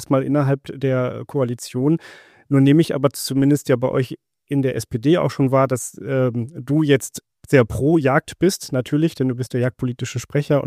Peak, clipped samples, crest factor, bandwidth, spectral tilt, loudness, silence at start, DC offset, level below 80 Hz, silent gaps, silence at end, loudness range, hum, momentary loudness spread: -2 dBFS; under 0.1%; 18 dB; 15.5 kHz; -6.5 dB/octave; -20 LUFS; 0 s; under 0.1%; -50 dBFS; none; 0 s; 1 LU; none; 8 LU